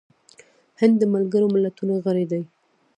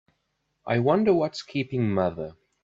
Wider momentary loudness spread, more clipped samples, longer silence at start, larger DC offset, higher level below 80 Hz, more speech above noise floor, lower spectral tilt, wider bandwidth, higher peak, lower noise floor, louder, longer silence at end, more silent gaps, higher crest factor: second, 9 LU vs 16 LU; neither; first, 0.8 s vs 0.65 s; neither; second, -74 dBFS vs -62 dBFS; second, 33 dB vs 52 dB; about the same, -8.5 dB/octave vs -7.5 dB/octave; first, 9.6 kHz vs 7.8 kHz; first, -4 dBFS vs -8 dBFS; second, -53 dBFS vs -76 dBFS; first, -21 LUFS vs -25 LUFS; first, 0.5 s vs 0.35 s; neither; about the same, 18 dB vs 18 dB